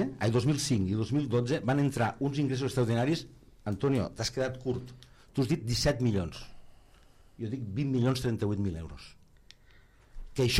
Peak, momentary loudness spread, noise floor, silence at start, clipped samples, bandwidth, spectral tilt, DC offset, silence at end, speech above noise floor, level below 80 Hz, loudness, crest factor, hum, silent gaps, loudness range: -14 dBFS; 12 LU; -58 dBFS; 0 s; under 0.1%; 15.5 kHz; -6 dB/octave; under 0.1%; 0 s; 29 dB; -52 dBFS; -31 LUFS; 18 dB; none; none; 5 LU